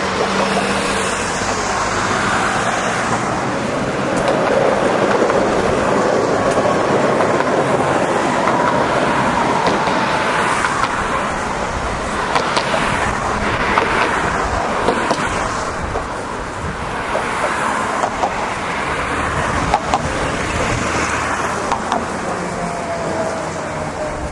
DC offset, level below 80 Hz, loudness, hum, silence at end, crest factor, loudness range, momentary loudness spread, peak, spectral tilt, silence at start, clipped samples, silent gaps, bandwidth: under 0.1%; -36 dBFS; -17 LUFS; none; 0 s; 18 dB; 4 LU; 7 LU; 0 dBFS; -4 dB/octave; 0 s; under 0.1%; none; 11.5 kHz